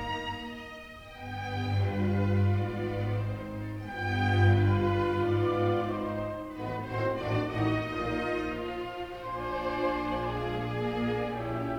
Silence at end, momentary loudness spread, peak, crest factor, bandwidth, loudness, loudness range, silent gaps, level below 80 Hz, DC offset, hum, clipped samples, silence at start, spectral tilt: 0 s; 11 LU; -12 dBFS; 18 dB; 6.8 kHz; -31 LUFS; 4 LU; none; -50 dBFS; under 0.1%; none; under 0.1%; 0 s; -8 dB/octave